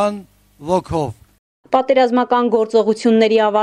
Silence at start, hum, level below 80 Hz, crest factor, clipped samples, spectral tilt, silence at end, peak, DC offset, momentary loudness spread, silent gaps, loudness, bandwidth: 0 s; none; -50 dBFS; 14 dB; under 0.1%; -6 dB/octave; 0 s; -2 dBFS; under 0.1%; 10 LU; 1.38-1.64 s; -16 LUFS; 11 kHz